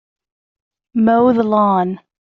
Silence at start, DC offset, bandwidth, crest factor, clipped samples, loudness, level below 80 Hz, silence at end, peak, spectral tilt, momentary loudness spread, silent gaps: 0.95 s; under 0.1%; 4.3 kHz; 14 dB; under 0.1%; -15 LUFS; -56 dBFS; 0.3 s; -2 dBFS; -7 dB/octave; 10 LU; none